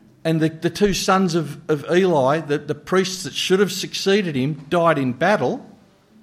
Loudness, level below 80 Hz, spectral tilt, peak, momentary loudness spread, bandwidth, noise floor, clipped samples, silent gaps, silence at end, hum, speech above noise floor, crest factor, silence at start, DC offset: -20 LUFS; -50 dBFS; -5 dB/octave; -4 dBFS; 7 LU; 15.5 kHz; -51 dBFS; under 0.1%; none; 0.55 s; none; 32 dB; 16 dB; 0.25 s; under 0.1%